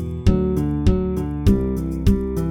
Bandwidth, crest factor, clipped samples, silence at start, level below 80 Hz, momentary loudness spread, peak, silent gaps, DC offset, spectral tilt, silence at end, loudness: 17 kHz; 16 dB; under 0.1%; 0 s; -24 dBFS; 3 LU; -4 dBFS; none; under 0.1%; -8.5 dB/octave; 0 s; -20 LUFS